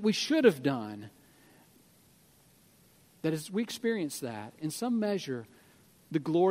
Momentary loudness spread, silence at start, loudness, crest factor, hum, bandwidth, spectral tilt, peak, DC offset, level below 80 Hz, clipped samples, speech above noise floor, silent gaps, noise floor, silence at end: 15 LU; 0 s; -31 LUFS; 22 dB; none; 16 kHz; -5 dB/octave; -10 dBFS; under 0.1%; -78 dBFS; under 0.1%; 32 dB; none; -62 dBFS; 0 s